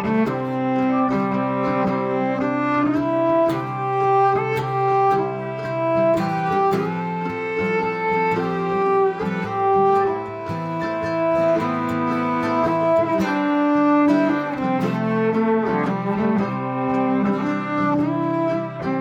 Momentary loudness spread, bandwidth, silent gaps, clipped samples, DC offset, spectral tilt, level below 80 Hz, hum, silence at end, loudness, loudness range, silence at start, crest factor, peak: 6 LU; 13.5 kHz; none; under 0.1%; under 0.1%; -8 dB/octave; -56 dBFS; none; 0 s; -20 LUFS; 2 LU; 0 s; 12 dB; -8 dBFS